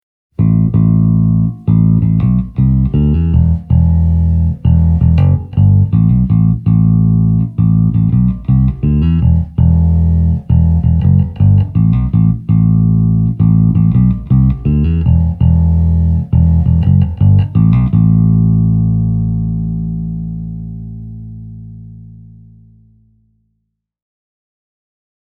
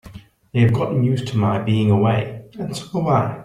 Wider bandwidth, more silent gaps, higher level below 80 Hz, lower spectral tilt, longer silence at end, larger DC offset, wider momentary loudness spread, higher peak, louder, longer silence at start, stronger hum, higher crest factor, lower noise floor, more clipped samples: second, 3 kHz vs 11.5 kHz; neither; first, -20 dBFS vs -50 dBFS; first, -12.5 dB/octave vs -7.5 dB/octave; first, 3.25 s vs 0 s; neither; second, 8 LU vs 12 LU; first, 0 dBFS vs -4 dBFS; first, -12 LUFS vs -19 LUFS; first, 0.4 s vs 0.05 s; neither; second, 10 dB vs 16 dB; first, -69 dBFS vs -41 dBFS; neither